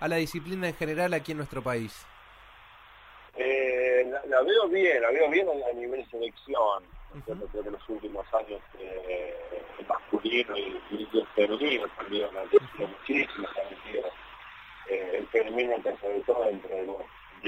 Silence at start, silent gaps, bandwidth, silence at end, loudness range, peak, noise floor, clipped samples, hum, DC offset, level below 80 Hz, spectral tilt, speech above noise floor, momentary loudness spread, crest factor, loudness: 0 s; none; 16 kHz; 0 s; 8 LU; -10 dBFS; -52 dBFS; under 0.1%; none; under 0.1%; -56 dBFS; -5.5 dB/octave; 23 dB; 17 LU; 20 dB; -29 LUFS